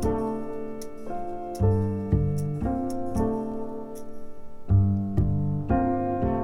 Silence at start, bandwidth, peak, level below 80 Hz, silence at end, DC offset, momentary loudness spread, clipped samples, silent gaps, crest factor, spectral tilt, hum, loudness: 0 s; 12 kHz; -10 dBFS; -36 dBFS; 0 s; under 0.1%; 14 LU; under 0.1%; none; 16 dB; -9.5 dB/octave; none; -27 LUFS